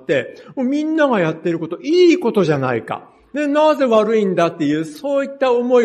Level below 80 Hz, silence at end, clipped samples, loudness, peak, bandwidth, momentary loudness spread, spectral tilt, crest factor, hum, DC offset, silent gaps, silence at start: -64 dBFS; 0 s; under 0.1%; -17 LUFS; -2 dBFS; 12.5 kHz; 10 LU; -6.5 dB/octave; 14 dB; none; under 0.1%; none; 0.1 s